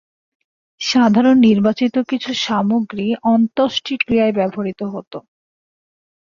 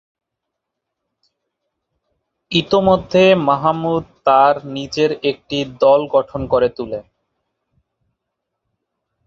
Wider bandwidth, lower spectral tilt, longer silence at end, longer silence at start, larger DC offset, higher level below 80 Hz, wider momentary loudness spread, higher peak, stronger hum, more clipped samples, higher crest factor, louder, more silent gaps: about the same, 7.4 kHz vs 7.4 kHz; about the same, -5.5 dB/octave vs -6 dB/octave; second, 1.1 s vs 2.25 s; second, 0.8 s vs 2.5 s; neither; second, -56 dBFS vs -48 dBFS; first, 14 LU vs 11 LU; about the same, -2 dBFS vs -2 dBFS; neither; neither; about the same, 14 dB vs 18 dB; about the same, -16 LUFS vs -16 LUFS; first, 5.07-5.11 s vs none